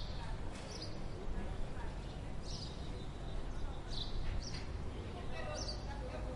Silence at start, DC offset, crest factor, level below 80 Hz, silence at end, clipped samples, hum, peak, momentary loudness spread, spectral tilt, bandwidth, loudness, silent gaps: 0 s; under 0.1%; 14 dB; -44 dBFS; 0 s; under 0.1%; none; -26 dBFS; 4 LU; -5 dB/octave; 11.5 kHz; -45 LUFS; none